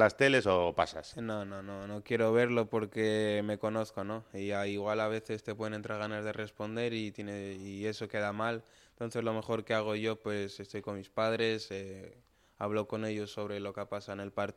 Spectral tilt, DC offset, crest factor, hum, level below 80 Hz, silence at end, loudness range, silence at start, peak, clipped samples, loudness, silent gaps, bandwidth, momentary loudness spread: -5.5 dB/octave; under 0.1%; 22 dB; none; -68 dBFS; 0.05 s; 5 LU; 0 s; -12 dBFS; under 0.1%; -34 LUFS; none; 14 kHz; 12 LU